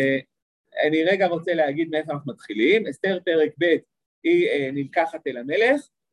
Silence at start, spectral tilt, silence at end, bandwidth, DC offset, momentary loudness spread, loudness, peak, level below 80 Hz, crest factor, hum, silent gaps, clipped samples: 0 s; -6 dB/octave; 0.3 s; 11.5 kHz; under 0.1%; 8 LU; -22 LUFS; -6 dBFS; -74 dBFS; 16 dB; none; 0.42-0.64 s, 4.06-4.22 s; under 0.1%